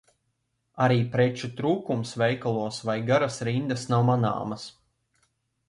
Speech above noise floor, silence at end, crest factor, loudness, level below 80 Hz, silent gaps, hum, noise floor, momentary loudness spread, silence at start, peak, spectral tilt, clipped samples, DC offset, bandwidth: 51 dB; 1 s; 16 dB; -26 LUFS; -62 dBFS; none; none; -76 dBFS; 8 LU; 0.75 s; -10 dBFS; -6.5 dB/octave; under 0.1%; under 0.1%; 11.5 kHz